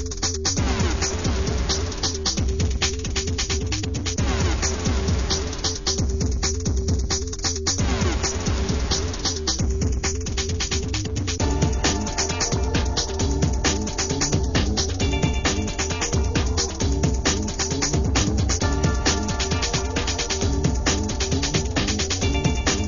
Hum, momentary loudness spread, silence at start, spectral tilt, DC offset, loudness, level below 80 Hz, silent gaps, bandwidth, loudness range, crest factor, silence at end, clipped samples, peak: none; 3 LU; 0 s; -4 dB/octave; 0.6%; -23 LUFS; -28 dBFS; none; 7.4 kHz; 1 LU; 18 dB; 0 s; under 0.1%; -4 dBFS